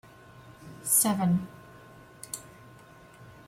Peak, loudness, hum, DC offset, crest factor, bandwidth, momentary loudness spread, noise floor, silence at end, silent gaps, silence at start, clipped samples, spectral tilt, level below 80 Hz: -12 dBFS; -26 LUFS; none; under 0.1%; 20 dB; 16 kHz; 26 LU; -52 dBFS; 0.15 s; none; 0.45 s; under 0.1%; -4 dB/octave; -64 dBFS